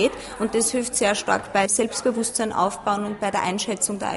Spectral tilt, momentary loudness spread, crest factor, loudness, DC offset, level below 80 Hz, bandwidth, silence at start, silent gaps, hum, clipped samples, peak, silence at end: -2.5 dB/octave; 4 LU; 18 dB; -23 LUFS; under 0.1%; -54 dBFS; 11.5 kHz; 0 s; none; none; under 0.1%; -6 dBFS; 0 s